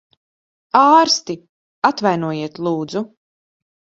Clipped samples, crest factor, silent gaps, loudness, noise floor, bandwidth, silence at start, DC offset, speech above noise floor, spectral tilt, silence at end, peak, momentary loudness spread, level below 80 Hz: under 0.1%; 18 dB; 1.49-1.82 s; -17 LUFS; under -90 dBFS; 7.8 kHz; 0.75 s; under 0.1%; over 74 dB; -4 dB/octave; 0.95 s; 0 dBFS; 17 LU; -66 dBFS